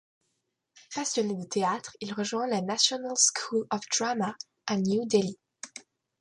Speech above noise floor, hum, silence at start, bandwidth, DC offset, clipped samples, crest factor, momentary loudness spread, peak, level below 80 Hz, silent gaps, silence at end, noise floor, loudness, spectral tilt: 51 dB; none; 0.75 s; 11.5 kHz; under 0.1%; under 0.1%; 22 dB; 16 LU; -8 dBFS; -74 dBFS; none; 0.4 s; -80 dBFS; -28 LUFS; -3 dB/octave